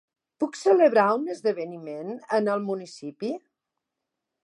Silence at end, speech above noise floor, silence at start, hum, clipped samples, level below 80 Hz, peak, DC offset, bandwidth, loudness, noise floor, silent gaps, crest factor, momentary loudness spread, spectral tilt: 1.05 s; 60 dB; 0.4 s; none; under 0.1%; -84 dBFS; -6 dBFS; under 0.1%; 11.5 kHz; -25 LUFS; -84 dBFS; none; 20 dB; 17 LU; -5.5 dB/octave